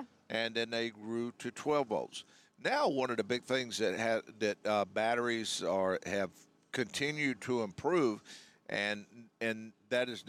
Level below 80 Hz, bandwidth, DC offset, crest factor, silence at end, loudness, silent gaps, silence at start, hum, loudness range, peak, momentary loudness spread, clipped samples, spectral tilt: -78 dBFS; 14.5 kHz; under 0.1%; 16 dB; 0 s; -35 LUFS; none; 0 s; none; 2 LU; -18 dBFS; 8 LU; under 0.1%; -4 dB/octave